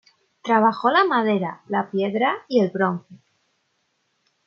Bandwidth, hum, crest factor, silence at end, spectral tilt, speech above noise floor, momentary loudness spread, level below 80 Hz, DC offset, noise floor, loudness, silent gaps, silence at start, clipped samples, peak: 6.8 kHz; none; 18 dB; 1.3 s; -7 dB/octave; 50 dB; 8 LU; -76 dBFS; under 0.1%; -71 dBFS; -21 LUFS; none; 0.45 s; under 0.1%; -4 dBFS